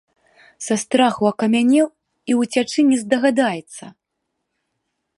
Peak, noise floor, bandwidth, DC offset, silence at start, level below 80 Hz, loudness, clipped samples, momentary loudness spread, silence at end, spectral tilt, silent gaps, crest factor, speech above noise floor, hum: -2 dBFS; -76 dBFS; 11.5 kHz; under 0.1%; 0.6 s; -68 dBFS; -18 LUFS; under 0.1%; 16 LU; 1.3 s; -4 dB/octave; none; 18 dB; 59 dB; none